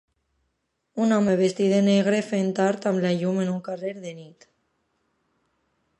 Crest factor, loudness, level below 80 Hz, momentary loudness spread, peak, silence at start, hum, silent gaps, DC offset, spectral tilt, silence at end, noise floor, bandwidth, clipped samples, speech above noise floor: 16 dB; -23 LUFS; -70 dBFS; 15 LU; -8 dBFS; 0.95 s; none; none; under 0.1%; -6.5 dB/octave; 1.7 s; -76 dBFS; 10.5 kHz; under 0.1%; 53 dB